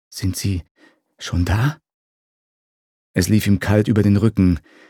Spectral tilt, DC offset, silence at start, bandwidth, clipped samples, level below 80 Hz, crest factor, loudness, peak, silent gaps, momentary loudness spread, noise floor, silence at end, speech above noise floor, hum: -6.5 dB/octave; under 0.1%; 0.1 s; 18 kHz; under 0.1%; -38 dBFS; 18 dB; -19 LUFS; -2 dBFS; 0.71-0.75 s, 1.94-3.14 s; 10 LU; under -90 dBFS; 0.3 s; over 72 dB; none